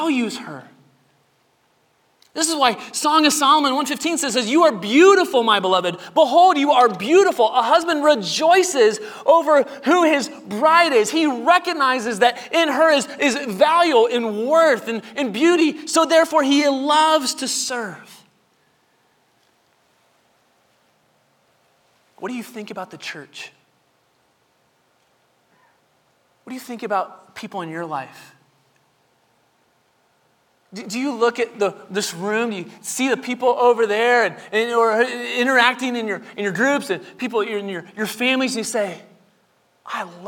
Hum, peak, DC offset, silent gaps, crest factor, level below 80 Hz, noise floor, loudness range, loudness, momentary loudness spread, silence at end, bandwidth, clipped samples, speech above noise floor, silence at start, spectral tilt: none; 0 dBFS; under 0.1%; none; 20 dB; -74 dBFS; -63 dBFS; 19 LU; -18 LUFS; 16 LU; 0 s; 19.5 kHz; under 0.1%; 45 dB; 0 s; -2.5 dB/octave